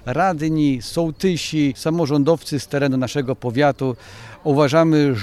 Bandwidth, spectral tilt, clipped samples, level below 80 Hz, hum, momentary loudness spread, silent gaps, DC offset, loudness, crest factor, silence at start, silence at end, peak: 13.5 kHz; -6.5 dB/octave; under 0.1%; -48 dBFS; none; 9 LU; none; under 0.1%; -19 LUFS; 16 dB; 0.05 s; 0 s; -4 dBFS